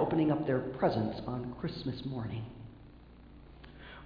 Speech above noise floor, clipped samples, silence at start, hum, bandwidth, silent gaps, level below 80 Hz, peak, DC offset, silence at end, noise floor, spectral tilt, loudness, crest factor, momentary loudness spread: 21 dB; under 0.1%; 0 s; 60 Hz at -55 dBFS; 5.2 kHz; none; -56 dBFS; -16 dBFS; under 0.1%; 0 s; -54 dBFS; -6.5 dB/octave; -34 LUFS; 18 dB; 25 LU